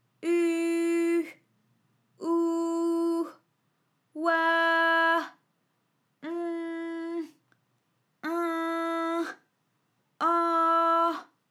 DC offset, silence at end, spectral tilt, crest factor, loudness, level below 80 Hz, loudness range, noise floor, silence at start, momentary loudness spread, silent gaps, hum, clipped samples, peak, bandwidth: under 0.1%; 0.25 s; -2.5 dB/octave; 16 dB; -27 LUFS; under -90 dBFS; 7 LU; -74 dBFS; 0.2 s; 15 LU; none; none; under 0.1%; -12 dBFS; 13 kHz